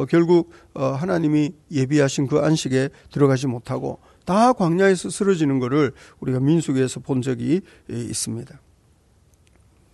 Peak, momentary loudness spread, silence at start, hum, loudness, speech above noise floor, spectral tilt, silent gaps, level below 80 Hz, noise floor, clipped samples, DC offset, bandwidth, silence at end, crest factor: -6 dBFS; 11 LU; 0 s; none; -21 LUFS; 37 dB; -6 dB/octave; none; -56 dBFS; -57 dBFS; under 0.1%; under 0.1%; 12 kHz; 1.5 s; 16 dB